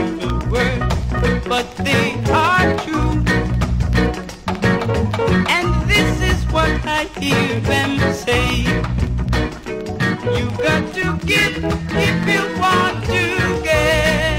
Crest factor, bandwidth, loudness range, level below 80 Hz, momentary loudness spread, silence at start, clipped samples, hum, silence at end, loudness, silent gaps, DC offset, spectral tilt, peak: 16 dB; 16 kHz; 2 LU; -26 dBFS; 6 LU; 0 s; under 0.1%; none; 0 s; -17 LUFS; none; under 0.1%; -5.5 dB/octave; -2 dBFS